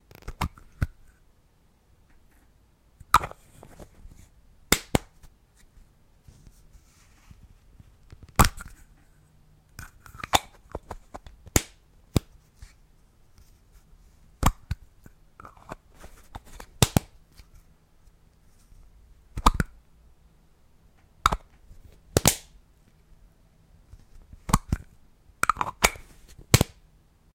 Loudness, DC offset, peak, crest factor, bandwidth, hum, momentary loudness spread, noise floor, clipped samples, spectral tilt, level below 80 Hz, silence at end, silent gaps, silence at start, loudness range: -26 LUFS; under 0.1%; -4 dBFS; 28 dB; 16.5 kHz; none; 24 LU; -62 dBFS; under 0.1%; -3.5 dB/octave; -40 dBFS; 0.7 s; none; 0.25 s; 5 LU